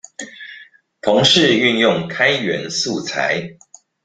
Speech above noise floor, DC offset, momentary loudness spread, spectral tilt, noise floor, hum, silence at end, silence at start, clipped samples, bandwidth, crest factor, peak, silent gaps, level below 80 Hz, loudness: 28 dB; under 0.1%; 21 LU; -3.5 dB/octave; -44 dBFS; none; 0.5 s; 0.2 s; under 0.1%; 9.6 kHz; 18 dB; 0 dBFS; none; -56 dBFS; -16 LUFS